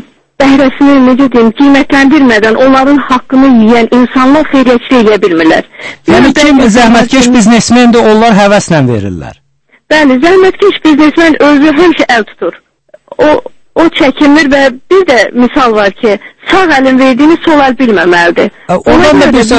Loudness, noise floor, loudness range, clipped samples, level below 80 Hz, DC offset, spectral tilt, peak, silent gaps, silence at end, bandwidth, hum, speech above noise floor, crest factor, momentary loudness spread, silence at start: -5 LUFS; -32 dBFS; 3 LU; 5%; -32 dBFS; under 0.1%; -5 dB/octave; 0 dBFS; none; 0 s; 11 kHz; none; 27 dB; 6 dB; 7 LU; 0.4 s